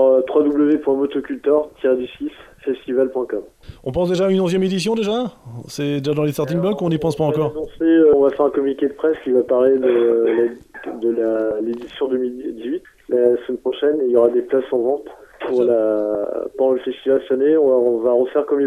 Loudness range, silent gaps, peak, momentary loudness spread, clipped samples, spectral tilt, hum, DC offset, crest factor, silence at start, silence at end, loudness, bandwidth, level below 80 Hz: 4 LU; none; 0 dBFS; 11 LU; under 0.1%; -7 dB/octave; none; under 0.1%; 16 dB; 0 s; 0 s; -18 LUFS; 14 kHz; -52 dBFS